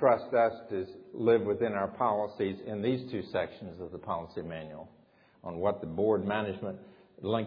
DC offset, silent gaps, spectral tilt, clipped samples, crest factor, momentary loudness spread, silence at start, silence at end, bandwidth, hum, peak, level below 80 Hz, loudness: under 0.1%; none; -5.5 dB/octave; under 0.1%; 20 dB; 15 LU; 0 s; 0 s; 5.2 kHz; none; -12 dBFS; -66 dBFS; -32 LUFS